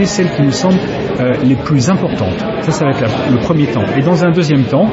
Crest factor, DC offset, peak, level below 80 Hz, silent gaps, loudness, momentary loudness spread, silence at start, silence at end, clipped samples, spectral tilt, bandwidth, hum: 12 dB; under 0.1%; 0 dBFS; -38 dBFS; none; -13 LUFS; 5 LU; 0 s; 0 s; under 0.1%; -6.5 dB/octave; 8 kHz; none